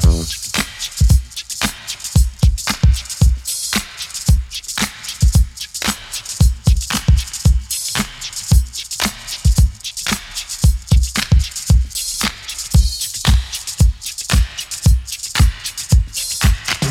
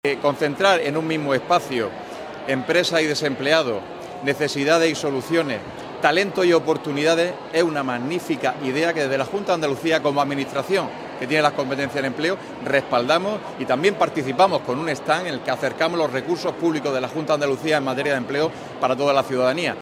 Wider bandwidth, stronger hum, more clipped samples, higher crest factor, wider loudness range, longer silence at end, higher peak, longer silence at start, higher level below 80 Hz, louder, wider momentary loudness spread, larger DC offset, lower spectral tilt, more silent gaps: about the same, 16.5 kHz vs 16 kHz; neither; neither; second, 16 dB vs 22 dB; about the same, 1 LU vs 2 LU; about the same, 0 s vs 0 s; about the same, 0 dBFS vs 0 dBFS; about the same, 0 s vs 0.05 s; first, -18 dBFS vs -62 dBFS; first, -18 LUFS vs -21 LUFS; about the same, 7 LU vs 7 LU; neither; about the same, -3.5 dB/octave vs -4.5 dB/octave; neither